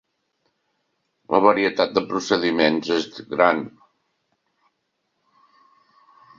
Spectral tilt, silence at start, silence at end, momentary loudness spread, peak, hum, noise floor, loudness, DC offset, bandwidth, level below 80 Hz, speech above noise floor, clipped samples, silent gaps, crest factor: -4.5 dB/octave; 1.3 s; 2.7 s; 8 LU; 0 dBFS; none; -74 dBFS; -20 LUFS; under 0.1%; 7.6 kHz; -64 dBFS; 54 dB; under 0.1%; none; 24 dB